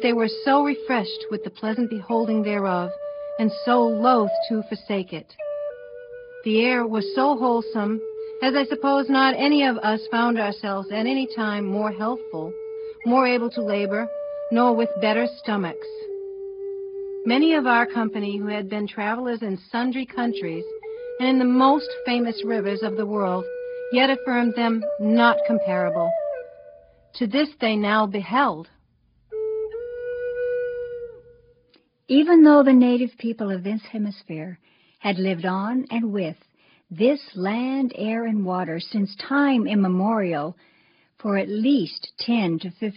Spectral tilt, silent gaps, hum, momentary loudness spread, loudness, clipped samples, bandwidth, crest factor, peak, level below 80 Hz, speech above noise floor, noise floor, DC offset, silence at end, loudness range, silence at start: -4 dB/octave; none; none; 14 LU; -22 LUFS; under 0.1%; 5.4 kHz; 18 dB; -4 dBFS; -66 dBFS; 41 dB; -62 dBFS; under 0.1%; 0.05 s; 6 LU; 0 s